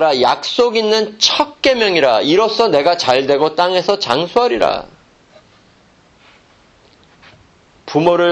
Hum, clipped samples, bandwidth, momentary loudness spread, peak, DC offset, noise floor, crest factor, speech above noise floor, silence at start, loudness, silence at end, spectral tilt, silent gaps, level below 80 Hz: none; under 0.1%; 9 kHz; 3 LU; 0 dBFS; under 0.1%; -50 dBFS; 16 dB; 36 dB; 0 s; -14 LUFS; 0 s; -3.5 dB/octave; none; -52 dBFS